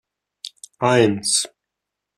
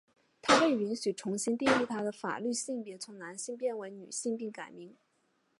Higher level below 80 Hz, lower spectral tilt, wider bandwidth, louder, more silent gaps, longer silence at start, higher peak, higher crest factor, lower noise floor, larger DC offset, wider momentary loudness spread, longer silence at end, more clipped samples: first, -62 dBFS vs -74 dBFS; about the same, -3.5 dB/octave vs -3 dB/octave; first, 14 kHz vs 11.5 kHz; first, -18 LUFS vs -32 LUFS; neither; about the same, 0.45 s vs 0.45 s; first, -2 dBFS vs -10 dBFS; about the same, 20 dB vs 24 dB; first, -83 dBFS vs -75 dBFS; neither; first, 20 LU vs 17 LU; about the same, 0.7 s vs 0.7 s; neither